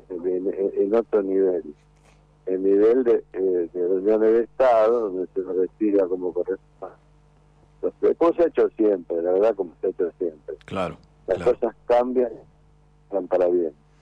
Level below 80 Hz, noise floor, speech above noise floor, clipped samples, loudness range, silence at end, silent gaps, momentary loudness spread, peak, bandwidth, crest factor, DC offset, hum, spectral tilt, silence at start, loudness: -56 dBFS; -56 dBFS; 34 dB; under 0.1%; 5 LU; 0.3 s; none; 12 LU; -12 dBFS; 7.8 kHz; 12 dB; under 0.1%; 50 Hz at -55 dBFS; -8 dB/octave; 0.1 s; -23 LUFS